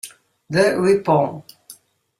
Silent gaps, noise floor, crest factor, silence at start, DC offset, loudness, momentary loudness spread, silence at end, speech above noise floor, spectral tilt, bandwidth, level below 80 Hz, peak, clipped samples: none; -47 dBFS; 16 dB; 0.05 s; under 0.1%; -18 LUFS; 19 LU; 0.45 s; 30 dB; -6 dB/octave; 15.5 kHz; -58 dBFS; -4 dBFS; under 0.1%